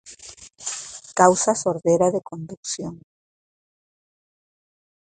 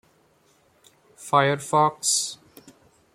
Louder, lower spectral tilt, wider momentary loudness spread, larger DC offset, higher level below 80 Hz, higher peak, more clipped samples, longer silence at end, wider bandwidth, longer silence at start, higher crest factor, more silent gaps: about the same, -21 LUFS vs -22 LUFS; about the same, -4 dB/octave vs -3 dB/octave; about the same, 20 LU vs 18 LU; neither; first, -62 dBFS vs -70 dBFS; first, 0 dBFS vs -4 dBFS; neither; first, 2.15 s vs 0.8 s; second, 9.6 kHz vs 16.5 kHz; second, 0.05 s vs 1.2 s; about the same, 24 dB vs 22 dB; first, 2.57-2.63 s vs none